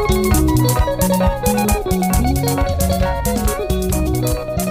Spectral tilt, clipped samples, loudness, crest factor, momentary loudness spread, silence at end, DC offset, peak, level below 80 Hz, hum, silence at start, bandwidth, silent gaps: -5.5 dB/octave; under 0.1%; -17 LUFS; 12 dB; 4 LU; 0 s; under 0.1%; -4 dBFS; -22 dBFS; none; 0 s; 16.5 kHz; none